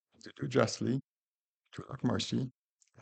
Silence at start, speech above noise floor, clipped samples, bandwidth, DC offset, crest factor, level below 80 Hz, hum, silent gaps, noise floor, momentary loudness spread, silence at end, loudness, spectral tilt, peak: 0.25 s; over 57 dB; under 0.1%; 9 kHz; under 0.1%; 24 dB; -70 dBFS; none; 1.04-1.12 s, 1.18-1.22 s, 1.28-1.60 s; under -90 dBFS; 19 LU; 0.5 s; -34 LUFS; -5.5 dB/octave; -12 dBFS